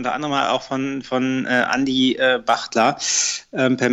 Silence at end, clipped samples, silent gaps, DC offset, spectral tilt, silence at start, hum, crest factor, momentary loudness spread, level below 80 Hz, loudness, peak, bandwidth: 0 s; under 0.1%; none; under 0.1%; -3 dB/octave; 0 s; none; 14 dB; 5 LU; -58 dBFS; -19 LUFS; -6 dBFS; 8.4 kHz